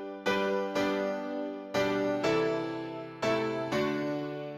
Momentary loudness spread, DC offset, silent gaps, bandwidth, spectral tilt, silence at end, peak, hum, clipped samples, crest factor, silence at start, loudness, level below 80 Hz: 8 LU; under 0.1%; none; 16 kHz; -5.5 dB/octave; 0 s; -16 dBFS; none; under 0.1%; 16 dB; 0 s; -31 LUFS; -66 dBFS